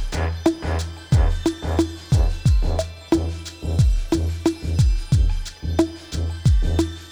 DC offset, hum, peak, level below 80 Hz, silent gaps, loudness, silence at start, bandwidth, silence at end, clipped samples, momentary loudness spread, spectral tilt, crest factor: under 0.1%; none; -4 dBFS; -24 dBFS; none; -22 LUFS; 0 s; 12.5 kHz; 0 s; under 0.1%; 7 LU; -6.5 dB/octave; 16 dB